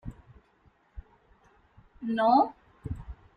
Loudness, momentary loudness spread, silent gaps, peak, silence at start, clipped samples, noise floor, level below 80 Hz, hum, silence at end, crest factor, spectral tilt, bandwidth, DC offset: -27 LUFS; 22 LU; none; -10 dBFS; 0.05 s; under 0.1%; -65 dBFS; -50 dBFS; none; 0.25 s; 22 dB; -8.5 dB/octave; 5.2 kHz; under 0.1%